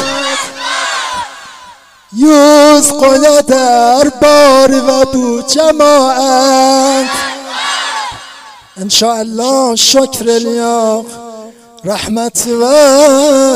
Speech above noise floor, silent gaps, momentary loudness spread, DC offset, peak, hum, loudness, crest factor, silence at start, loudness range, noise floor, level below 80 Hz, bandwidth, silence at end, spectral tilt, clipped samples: 30 dB; none; 14 LU; under 0.1%; 0 dBFS; none; -8 LUFS; 10 dB; 0 s; 5 LU; -37 dBFS; -44 dBFS; 16.5 kHz; 0 s; -2 dB/octave; 0.5%